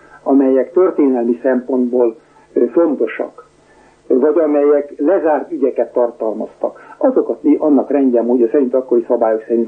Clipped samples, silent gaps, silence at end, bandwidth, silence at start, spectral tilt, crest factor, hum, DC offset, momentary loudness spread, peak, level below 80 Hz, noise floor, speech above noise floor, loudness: under 0.1%; none; 0 s; 3.3 kHz; 0.25 s; -8.5 dB/octave; 12 dB; none; under 0.1%; 8 LU; -2 dBFS; -64 dBFS; -48 dBFS; 34 dB; -15 LUFS